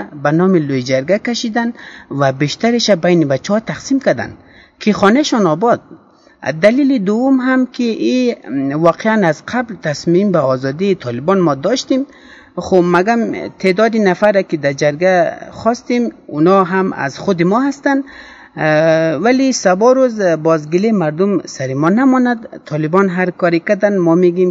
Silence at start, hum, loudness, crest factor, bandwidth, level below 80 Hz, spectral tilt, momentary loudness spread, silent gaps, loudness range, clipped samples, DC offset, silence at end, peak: 0 s; none; -14 LUFS; 14 dB; 7.8 kHz; -54 dBFS; -6 dB/octave; 8 LU; none; 2 LU; under 0.1%; under 0.1%; 0 s; 0 dBFS